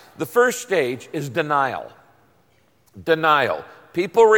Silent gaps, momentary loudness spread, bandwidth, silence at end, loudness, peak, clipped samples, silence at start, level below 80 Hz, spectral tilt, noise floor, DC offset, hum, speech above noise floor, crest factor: none; 13 LU; 17 kHz; 0 s; -21 LUFS; -4 dBFS; under 0.1%; 0.2 s; -66 dBFS; -4 dB/octave; -60 dBFS; under 0.1%; none; 41 dB; 16 dB